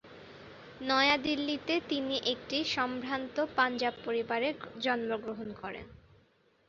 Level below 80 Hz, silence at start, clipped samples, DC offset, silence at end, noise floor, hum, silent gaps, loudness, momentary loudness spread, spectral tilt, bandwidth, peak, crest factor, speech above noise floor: -66 dBFS; 0.05 s; under 0.1%; under 0.1%; 0.7 s; -67 dBFS; none; none; -32 LUFS; 17 LU; -1 dB/octave; 7.4 kHz; -12 dBFS; 22 dB; 35 dB